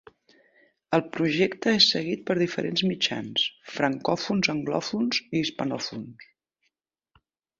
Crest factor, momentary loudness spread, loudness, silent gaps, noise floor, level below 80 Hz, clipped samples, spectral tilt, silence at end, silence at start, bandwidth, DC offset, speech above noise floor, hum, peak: 22 dB; 10 LU; -25 LUFS; none; -78 dBFS; -66 dBFS; under 0.1%; -4.5 dB/octave; 1.35 s; 0.9 s; 7.8 kHz; under 0.1%; 52 dB; none; -6 dBFS